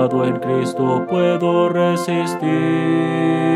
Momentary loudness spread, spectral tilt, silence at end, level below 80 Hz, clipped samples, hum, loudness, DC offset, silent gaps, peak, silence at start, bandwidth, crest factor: 3 LU; -7 dB/octave; 0 s; -66 dBFS; under 0.1%; none; -18 LUFS; under 0.1%; none; -4 dBFS; 0 s; 13.5 kHz; 14 dB